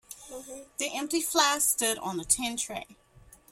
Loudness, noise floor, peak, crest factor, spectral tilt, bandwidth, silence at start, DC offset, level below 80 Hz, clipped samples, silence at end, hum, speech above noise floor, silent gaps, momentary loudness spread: -27 LUFS; -56 dBFS; -8 dBFS; 22 dB; -1 dB/octave; 16.5 kHz; 0.1 s; under 0.1%; -60 dBFS; under 0.1%; 0.6 s; none; 27 dB; none; 19 LU